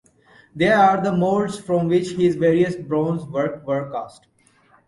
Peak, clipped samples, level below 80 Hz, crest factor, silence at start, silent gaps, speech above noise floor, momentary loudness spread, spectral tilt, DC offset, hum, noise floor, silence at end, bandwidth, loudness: -4 dBFS; under 0.1%; -58 dBFS; 16 dB; 0.55 s; none; 37 dB; 10 LU; -7 dB/octave; under 0.1%; none; -57 dBFS; 0.8 s; 11.5 kHz; -20 LUFS